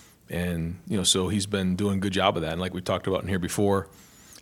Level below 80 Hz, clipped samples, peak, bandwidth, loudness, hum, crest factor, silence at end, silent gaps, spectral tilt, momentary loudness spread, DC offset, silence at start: -50 dBFS; under 0.1%; -6 dBFS; 16.5 kHz; -26 LUFS; none; 20 dB; 0.1 s; none; -4.5 dB/octave; 8 LU; under 0.1%; 0.3 s